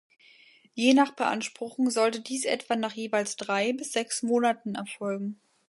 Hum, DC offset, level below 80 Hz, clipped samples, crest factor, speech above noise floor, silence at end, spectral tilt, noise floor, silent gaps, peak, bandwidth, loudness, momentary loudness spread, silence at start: none; under 0.1%; -80 dBFS; under 0.1%; 20 dB; 30 dB; 0.35 s; -3.5 dB/octave; -58 dBFS; none; -8 dBFS; 11.5 kHz; -28 LUFS; 11 LU; 0.75 s